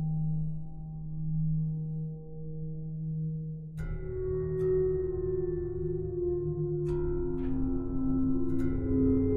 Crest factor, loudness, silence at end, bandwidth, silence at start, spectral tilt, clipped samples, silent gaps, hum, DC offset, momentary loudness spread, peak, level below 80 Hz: 14 dB; -33 LUFS; 0 s; 2.6 kHz; 0 s; -12 dB/octave; under 0.1%; none; none; under 0.1%; 11 LU; -18 dBFS; -40 dBFS